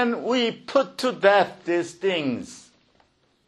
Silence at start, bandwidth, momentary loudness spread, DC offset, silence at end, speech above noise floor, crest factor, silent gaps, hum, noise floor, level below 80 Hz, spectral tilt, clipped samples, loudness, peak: 0 s; 12 kHz; 9 LU; under 0.1%; 0.9 s; 40 dB; 20 dB; none; none; -63 dBFS; -70 dBFS; -4.5 dB/octave; under 0.1%; -23 LUFS; -4 dBFS